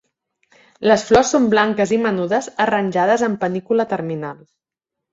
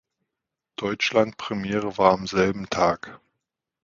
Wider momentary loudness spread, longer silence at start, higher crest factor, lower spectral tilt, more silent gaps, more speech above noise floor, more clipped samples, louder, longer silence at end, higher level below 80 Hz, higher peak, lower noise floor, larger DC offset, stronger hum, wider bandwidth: second, 9 LU vs 12 LU; about the same, 0.8 s vs 0.8 s; second, 18 dB vs 24 dB; about the same, -5 dB/octave vs -5 dB/octave; neither; first, 66 dB vs 62 dB; neither; first, -18 LUFS vs -23 LUFS; about the same, 0.8 s vs 0.7 s; about the same, -50 dBFS vs -54 dBFS; about the same, -2 dBFS vs -2 dBFS; about the same, -83 dBFS vs -85 dBFS; neither; neither; about the same, 7.8 kHz vs 7.6 kHz